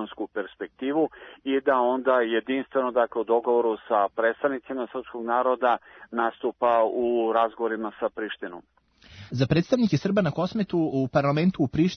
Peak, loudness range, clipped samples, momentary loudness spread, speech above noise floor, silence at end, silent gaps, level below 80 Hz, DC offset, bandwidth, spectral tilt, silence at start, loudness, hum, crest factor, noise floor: -8 dBFS; 2 LU; under 0.1%; 11 LU; 24 dB; 0 s; none; -60 dBFS; under 0.1%; 6.6 kHz; -7.5 dB/octave; 0 s; -25 LUFS; none; 16 dB; -49 dBFS